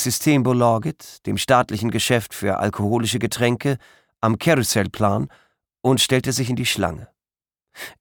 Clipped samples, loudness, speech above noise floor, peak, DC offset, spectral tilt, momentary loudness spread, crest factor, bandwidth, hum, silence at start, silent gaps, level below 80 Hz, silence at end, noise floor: under 0.1%; -20 LUFS; over 70 dB; -2 dBFS; under 0.1%; -4.5 dB/octave; 10 LU; 18 dB; 19 kHz; none; 0 s; none; -52 dBFS; 0.1 s; under -90 dBFS